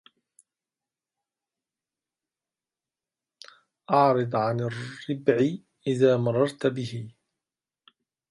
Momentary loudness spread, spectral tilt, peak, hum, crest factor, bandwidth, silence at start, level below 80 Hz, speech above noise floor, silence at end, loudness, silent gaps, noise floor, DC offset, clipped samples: 13 LU; -7.5 dB/octave; -6 dBFS; none; 22 dB; 11.5 kHz; 3.9 s; -72 dBFS; over 66 dB; 1.2 s; -25 LUFS; none; under -90 dBFS; under 0.1%; under 0.1%